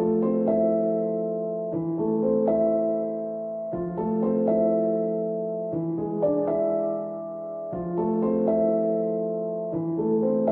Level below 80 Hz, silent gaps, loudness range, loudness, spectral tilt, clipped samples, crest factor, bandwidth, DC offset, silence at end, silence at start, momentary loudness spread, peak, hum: -60 dBFS; none; 2 LU; -26 LUFS; -13.5 dB/octave; under 0.1%; 14 dB; 2.8 kHz; under 0.1%; 0 s; 0 s; 8 LU; -12 dBFS; none